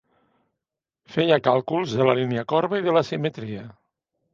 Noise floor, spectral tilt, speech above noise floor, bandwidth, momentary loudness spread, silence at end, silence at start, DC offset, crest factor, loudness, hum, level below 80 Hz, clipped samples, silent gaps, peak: -87 dBFS; -6.5 dB/octave; 65 dB; 7.4 kHz; 12 LU; 0.6 s; 1.1 s; under 0.1%; 22 dB; -22 LUFS; none; -64 dBFS; under 0.1%; none; -2 dBFS